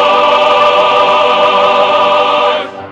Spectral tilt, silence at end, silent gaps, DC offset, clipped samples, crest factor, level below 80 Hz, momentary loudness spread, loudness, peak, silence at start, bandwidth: -3 dB/octave; 0 s; none; under 0.1%; under 0.1%; 10 dB; -52 dBFS; 3 LU; -9 LUFS; 0 dBFS; 0 s; 8.8 kHz